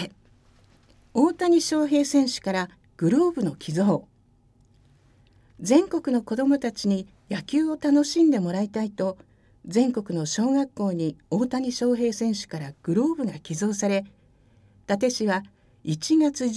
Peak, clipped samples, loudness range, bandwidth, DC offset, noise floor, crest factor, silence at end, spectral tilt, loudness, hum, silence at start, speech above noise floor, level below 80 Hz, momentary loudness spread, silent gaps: -6 dBFS; under 0.1%; 4 LU; 11 kHz; under 0.1%; -60 dBFS; 20 dB; 0 s; -5.5 dB/octave; -24 LUFS; none; 0 s; 37 dB; -62 dBFS; 9 LU; none